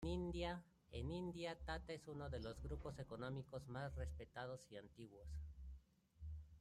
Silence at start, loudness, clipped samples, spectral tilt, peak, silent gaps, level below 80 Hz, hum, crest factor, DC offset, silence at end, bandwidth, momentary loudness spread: 0 s; -51 LUFS; under 0.1%; -6.5 dB/octave; -34 dBFS; none; -58 dBFS; none; 16 dB; under 0.1%; 0 s; 12.5 kHz; 11 LU